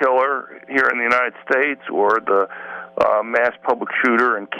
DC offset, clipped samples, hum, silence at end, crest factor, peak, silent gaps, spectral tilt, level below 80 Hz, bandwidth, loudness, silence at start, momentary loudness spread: under 0.1%; under 0.1%; none; 0 s; 14 dB; -4 dBFS; none; -5 dB/octave; -62 dBFS; 9.6 kHz; -18 LUFS; 0 s; 7 LU